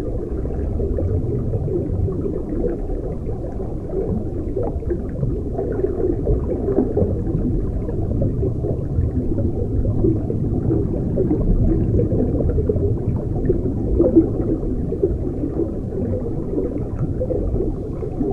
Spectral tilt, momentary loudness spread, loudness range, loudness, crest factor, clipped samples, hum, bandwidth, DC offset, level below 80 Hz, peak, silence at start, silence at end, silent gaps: -12 dB/octave; 6 LU; 5 LU; -22 LUFS; 16 dB; under 0.1%; none; 2.8 kHz; under 0.1%; -26 dBFS; -4 dBFS; 0 s; 0 s; none